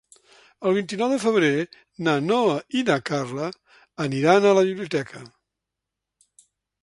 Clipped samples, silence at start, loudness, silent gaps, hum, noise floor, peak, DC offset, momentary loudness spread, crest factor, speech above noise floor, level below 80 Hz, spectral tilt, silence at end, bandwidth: under 0.1%; 0.6 s; -22 LUFS; none; none; -85 dBFS; -2 dBFS; under 0.1%; 13 LU; 20 dB; 63 dB; -68 dBFS; -5.5 dB/octave; 1.55 s; 11.5 kHz